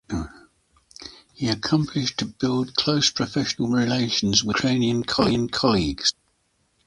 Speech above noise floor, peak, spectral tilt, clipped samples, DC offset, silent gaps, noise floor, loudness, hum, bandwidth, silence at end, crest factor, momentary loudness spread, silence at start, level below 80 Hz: 46 dB; -2 dBFS; -4 dB/octave; under 0.1%; under 0.1%; none; -68 dBFS; -22 LUFS; none; 11.5 kHz; 0.75 s; 22 dB; 12 LU; 0.1 s; -46 dBFS